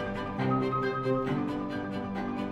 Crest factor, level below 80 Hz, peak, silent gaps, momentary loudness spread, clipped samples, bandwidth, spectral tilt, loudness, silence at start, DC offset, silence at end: 14 dB; -52 dBFS; -16 dBFS; none; 6 LU; under 0.1%; 10.5 kHz; -8 dB/octave; -31 LUFS; 0 s; under 0.1%; 0 s